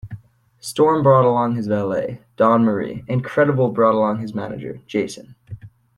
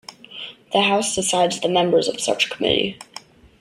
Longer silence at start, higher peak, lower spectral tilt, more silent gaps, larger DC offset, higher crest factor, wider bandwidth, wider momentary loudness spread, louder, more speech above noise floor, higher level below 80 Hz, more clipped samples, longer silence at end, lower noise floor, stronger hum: about the same, 0.05 s vs 0.1 s; about the same, -2 dBFS vs -2 dBFS; first, -7 dB/octave vs -3 dB/octave; neither; neither; about the same, 16 dB vs 18 dB; second, 12.5 kHz vs 15.5 kHz; first, 23 LU vs 19 LU; about the same, -19 LUFS vs -19 LUFS; about the same, 24 dB vs 23 dB; about the same, -56 dBFS vs -56 dBFS; neither; about the same, 0.3 s vs 0.4 s; about the same, -42 dBFS vs -43 dBFS; neither